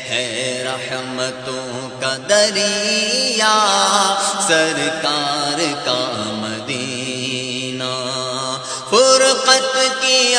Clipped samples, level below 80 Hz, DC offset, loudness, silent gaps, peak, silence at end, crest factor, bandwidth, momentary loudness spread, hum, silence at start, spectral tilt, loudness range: under 0.1%; -62 dBFS; under 0.1%; -16 LUFS; none; 0 dBFS; 0 s; 18 dB; 10.5 kHz; 10 LU; none; 0 s; -1.5 dB/octave; 6 LU